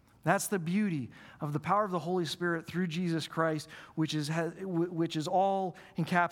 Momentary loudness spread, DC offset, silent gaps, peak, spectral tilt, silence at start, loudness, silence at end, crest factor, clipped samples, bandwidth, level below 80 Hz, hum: 8 LU; under 0.1%; none; -10 dBFS; -5.5 dB/octave; 0.25 s; -32 LUFS; 0 s; 22 dB; under 0.1%; 18.5 kHz; -72 dBFS; none